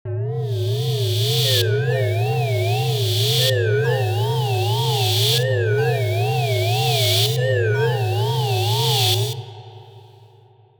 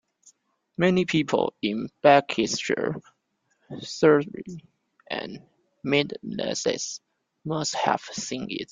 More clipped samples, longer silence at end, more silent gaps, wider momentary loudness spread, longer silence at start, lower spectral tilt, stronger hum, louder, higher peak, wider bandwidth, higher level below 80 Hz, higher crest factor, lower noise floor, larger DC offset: neither; first, 0.8 s vs 0.1 s; neither; second, 5 LU vs 19 LU; second, 0.05 s vs 0.8 s; about the same, -4.5 dB/octave vs -4.5 dB/octave; neither; first, -19 LUFS vs -25 LUFS; second, -8 dBFS vs -2 dBFS; first, over 20 kHz vs 9.6 kHz; about the same, -62 dBFS vs -64 dBFS; second, 12 dB vs 24 dB; second, -51 dBFS vs -72 dBFS; neither